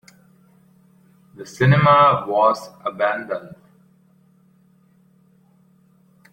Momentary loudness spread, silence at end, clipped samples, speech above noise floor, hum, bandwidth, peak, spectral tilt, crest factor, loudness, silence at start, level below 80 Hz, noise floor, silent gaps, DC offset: 17 LU; 2.85 s; under 0.1%; 39 dB; none; 10 kHz; -2 dBFS; -7 dB/octave; 20 dB; -17 LUFS; 1.4 s; -58 dBFS; -56 dBFS; none; under 0.1%